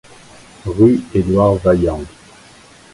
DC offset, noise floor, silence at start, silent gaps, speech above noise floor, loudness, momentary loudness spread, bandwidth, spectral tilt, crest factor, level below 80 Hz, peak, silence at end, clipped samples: under 0.1%; -43 dBFS; 0.65 s; none; 30 dB; -14 LUFS; 16 LU; 11.5 kHz; -8.5 dB/octave; 16 dB; -34 dBFS; 0 dBFS; 0.85 s; under 0.1%